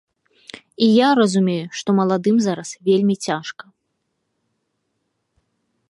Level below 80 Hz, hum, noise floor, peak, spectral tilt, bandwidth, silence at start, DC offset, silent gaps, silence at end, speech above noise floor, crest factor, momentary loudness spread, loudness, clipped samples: -70 dBFS; none; -73 dBFS; -2 dBFS; -5.5 dB/octave; 11.5 kHz; 0.8 s; under 0.1%; none; 2.4 s; 56 dB; 18 dB; 18 LU; -18 LUFS; under 0.1%